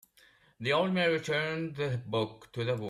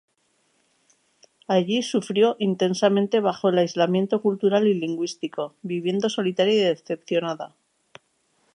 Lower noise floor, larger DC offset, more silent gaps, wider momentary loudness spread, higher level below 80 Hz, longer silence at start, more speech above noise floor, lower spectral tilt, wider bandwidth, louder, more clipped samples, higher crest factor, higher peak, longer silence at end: second, -63 dBFS vs -68 dBFS; neither; neither; about the same, 9 LU vs 10 LU; first, -68 dBFS vs -76 dBFS; second, 0.6 s vs 1.5 s; second, 32 dB vs 46 dB; about the same, -6 dB/octave vs -5.5 dB/octave; first, 14 kHz vs 11 kHz; second, -31 LUFS vs -23 LUFS; neither; about the same, 16 dB vs 18 dB; second, -16 dBFS vs -6 dBFS; second, 0 s vs 1.1 s